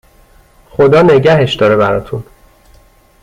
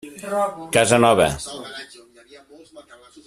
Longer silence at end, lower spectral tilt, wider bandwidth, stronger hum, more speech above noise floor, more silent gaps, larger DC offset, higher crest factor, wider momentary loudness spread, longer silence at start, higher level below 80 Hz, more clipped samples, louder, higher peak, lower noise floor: first, 1 s vs 0.45 s; first, -7 dB/octave vs -4 dB/octave; second, 12 kHz vs 15 kHz; neither; first, 36 dB vs 29 dB; neither; neither; second, 12 dB vs 22 dB; about the same, 18 LU vs 20 LU; first, 0.8 s vs 0.05 s; first, -40 dBFS vs -50 dBFS; neither; first, -9 LUFS vs -18 LUFS; about the same, 0 dBFS vs 0 dBFS; about the same, -45 dBFS vs -48 dBFS